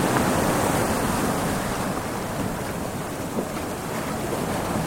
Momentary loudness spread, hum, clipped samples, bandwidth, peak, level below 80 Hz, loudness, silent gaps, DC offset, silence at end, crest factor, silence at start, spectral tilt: 8 LU; none; under 0.1%; 17 kHz; -4 dBFS; -42 dBFS; -25 LUFS; none; under 0.1%; 0 s; 20 dB; 0 s; -4.5 dB/octave